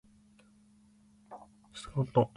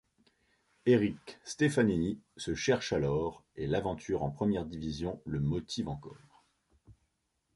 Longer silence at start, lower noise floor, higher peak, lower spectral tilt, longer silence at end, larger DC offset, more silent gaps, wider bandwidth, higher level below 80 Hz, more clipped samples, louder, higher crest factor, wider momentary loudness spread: first, 1.3 s vs 0.85 s; second, -63 dBFS vs -80 dBFS; about the same, -12 dBFS vs -14 dBFS; first, -7.5 dB/octave vs -6 dB/octave; second, 0.1 s vs 0.65 s; neither; neither; about the same, 11.5 kHz vs 11.5 kHz; second, -62 dBFS vs -54 dBFS; neither; about the same, -33 LUFS vs -33 LUFS; about the same, 24 dB vs 20 dB; first, 23 LU vs 12 LU